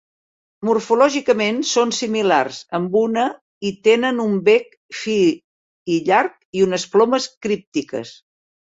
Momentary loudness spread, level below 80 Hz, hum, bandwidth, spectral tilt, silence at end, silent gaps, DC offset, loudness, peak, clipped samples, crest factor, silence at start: 11 LU; -64 dBFS; none; 8 kHz; -4 dB/octave; 0.6 s; 3.41-3.61 s, 4.77-4.89 s, 5.44-5.86 s, 6.45-6.53 s, 7.37-7.41 s, 7.67-7.72 s; under 0.1%; -18 LUFS; -2 dBFS; under 0.1%; 18 dB; 0.6 s